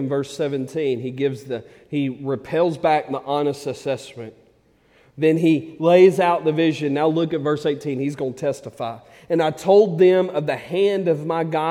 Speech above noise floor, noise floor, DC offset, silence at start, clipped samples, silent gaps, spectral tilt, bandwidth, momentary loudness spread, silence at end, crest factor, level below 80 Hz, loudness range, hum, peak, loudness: 38 dB; -57 dBFS; under 0.1%; 0 s; under 0.1%; none; -7 dB/octave; 13 kHz; 14 LU; 0 s; 18 dB; -64 dBFS; 5 LU; none; -2 dBFS; -20 LUFS